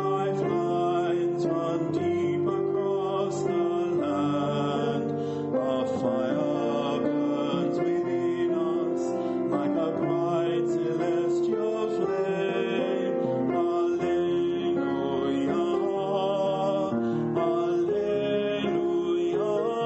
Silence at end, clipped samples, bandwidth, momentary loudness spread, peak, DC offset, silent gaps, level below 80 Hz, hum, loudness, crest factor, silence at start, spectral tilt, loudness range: 0 s; under 0.1%; 8.2 kHz; 2 LU; -14 dBFS; under 0.1%; none; -68 dBFS; none; -27 LUFS; 12 dB; 0 s; -7 dB/octave; 1 LU